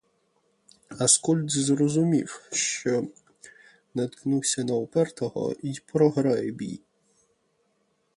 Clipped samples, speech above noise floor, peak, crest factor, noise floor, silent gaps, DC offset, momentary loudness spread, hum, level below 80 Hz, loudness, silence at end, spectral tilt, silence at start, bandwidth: under 0.1%; 46 dB; -6 dBFS; 22 dB; -71 dBFS; none; under 0.1%; 14 LU; none; -68 dBFS; -25 LUFS; 1.4 s; -4.5 dB/octave; 0.9 s; 11.5 kHz